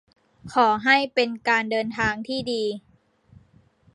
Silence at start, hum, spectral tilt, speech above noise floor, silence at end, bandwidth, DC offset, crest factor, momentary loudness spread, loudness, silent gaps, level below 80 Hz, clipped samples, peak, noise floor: 0.45 s; none; -4 dB/octave; 35 dB; 1.15 s; 11.5 kHz; under 0.1%; 22 dB; 9 LU; -22 LUFS; none; -56 dBFS; under 0.1%; -4 dBFS; -58 dBFS